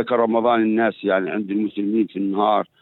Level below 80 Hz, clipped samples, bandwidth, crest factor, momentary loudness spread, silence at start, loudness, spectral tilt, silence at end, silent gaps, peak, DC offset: -70 dBFS; under 0.1%; 4.2 kHz; 14 dB; 5 LU; 0 s; -20 LUFS; -9.5 dB/octave; 0.15 s; none; -6 dBFS; under 0.1%